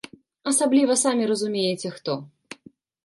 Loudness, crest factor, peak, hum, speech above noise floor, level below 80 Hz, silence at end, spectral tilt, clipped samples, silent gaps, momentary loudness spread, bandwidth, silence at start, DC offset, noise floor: -23 LUFS; 16 dB; -8 dBFS; none; 30 dB; -74 dBFS; 0.8 s; -3.5 dB/octave; under 0.1%; none; 24 LU; 11.5 kHz; 0.45 s; under 0.1%; -53 dBFS